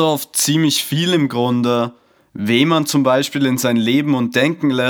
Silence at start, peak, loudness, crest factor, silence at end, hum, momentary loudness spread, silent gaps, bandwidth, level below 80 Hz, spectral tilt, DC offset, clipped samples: 0 s; 0 dBFS; -16 LUFS; 16 dB; 0 s; none; 4 LU; none; over 20 kHz; -70 dBFS; -4.5 dB/octave; under 0.1%; under 0.1%